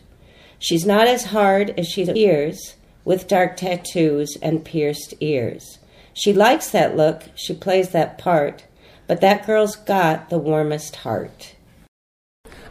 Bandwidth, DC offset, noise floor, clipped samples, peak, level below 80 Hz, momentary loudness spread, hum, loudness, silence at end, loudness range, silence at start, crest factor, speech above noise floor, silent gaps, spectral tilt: 15.5 kHz; under 0.1%; -48 dBFS; under 0.1%; -2 dBFS; -54 dBFS; 12 LU; none; -19 LUFS; 0 s; 3 LU; 0.6 s; 18 dB; 30 dB; 11.88-12.44 s; -5 dB/octave